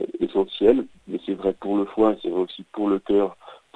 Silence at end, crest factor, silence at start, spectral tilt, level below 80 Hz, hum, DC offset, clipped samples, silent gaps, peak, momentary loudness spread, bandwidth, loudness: 0.2 s; 20 dB; 0 s; -8 dB/octave; -54 dBFS; none; under 0.1%; under 0.1%; none; -4 dBFS; 10 LU; 8.2 kHz; -23 LUFS